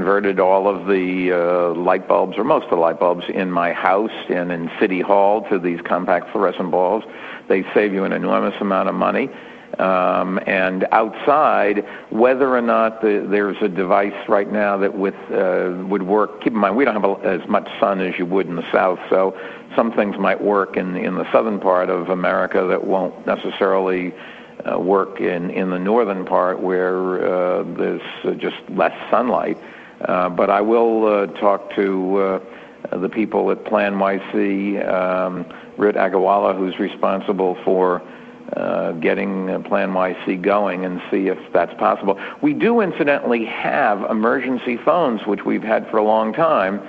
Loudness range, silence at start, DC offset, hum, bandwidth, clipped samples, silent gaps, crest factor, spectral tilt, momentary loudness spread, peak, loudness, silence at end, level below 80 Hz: 3 LU; 0 s; under 0.1%; none; 6 kHz; under 0.1%; none; 18 dB; -8.5 dB/octave; 7 LU; 0 dBFS; -19 LUFS; 0 s; -60 dBFS